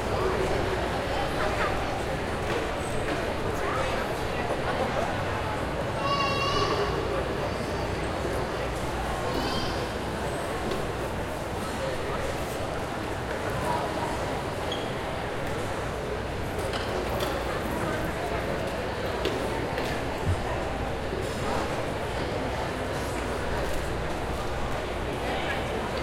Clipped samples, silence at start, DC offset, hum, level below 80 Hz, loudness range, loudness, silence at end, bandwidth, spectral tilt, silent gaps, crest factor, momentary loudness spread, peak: under 0.1%; 0 s; under 0.1%; none; -40 dBFS; 3 LU; -29 LUFS; 0 s; 16.5 kHz; -5 dB/octave; none; 16 dB; 4 LU; -12 dBFS